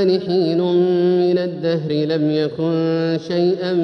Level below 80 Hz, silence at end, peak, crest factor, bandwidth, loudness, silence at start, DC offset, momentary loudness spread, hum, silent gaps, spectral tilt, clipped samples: -64 dBFS; 0 s; -6 dBFS; 10 dB; 6.2 kHz; -18 LUFS; 0 s; under 0.1%; 4 LU; none; none; -8.5 dB/octave; under 0.1%